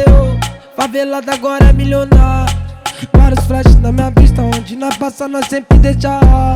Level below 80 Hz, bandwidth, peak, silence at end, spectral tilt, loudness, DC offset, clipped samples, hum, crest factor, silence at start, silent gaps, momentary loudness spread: -12 dBFS; 13.5 kHz; 0 dBFS; 0 s; -7 dB/octave; -12 LUFS; under 0.1%; 1%; none; 8 dB; 0 s; none; 10 LU